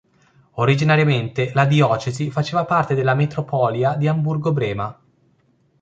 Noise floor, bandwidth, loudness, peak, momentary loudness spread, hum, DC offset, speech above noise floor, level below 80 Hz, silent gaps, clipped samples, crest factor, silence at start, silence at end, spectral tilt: -61 dBFS; 7.8 kHz; -19 LUFS; -2 dBFS; 8 LU; none; under 0.1%; 42 dB; -54 dBFS; none; under 0.1%; 16 dB; 0.55 s; 0.9 s; -7 dB/octave